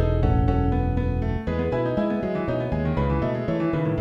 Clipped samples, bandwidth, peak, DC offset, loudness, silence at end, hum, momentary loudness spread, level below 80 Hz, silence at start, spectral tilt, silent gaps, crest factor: under 0.1%; 6 kHz; -6 dBFS; under 0.1%; -24 LUFS; 0 s; none; 4 LU; -30 dBFS; 0 s; -10 dB/octave; none; 16 dB